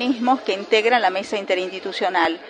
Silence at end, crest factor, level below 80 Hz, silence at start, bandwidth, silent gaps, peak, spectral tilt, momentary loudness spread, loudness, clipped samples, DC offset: 0 s; 16 dB; -70 dBFS; 0 s; 10 kHz; none; -4 dBFS; -3.5 dB/octave; 7 LU; -20 LUFS; under 0.1%; under 0.1%